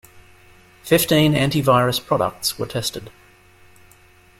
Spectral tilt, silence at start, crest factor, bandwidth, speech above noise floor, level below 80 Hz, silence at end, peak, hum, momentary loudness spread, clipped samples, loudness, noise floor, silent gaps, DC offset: -4.5 dB/octave; 0.15 s; 18 dB; 16.5 kHz; 32 dB; -50 dBFS; 1.3 s; -2 dBFS; none; 10 LU; under 0.1%; -19 LUFS; -51 dBFS; none; under 0.1%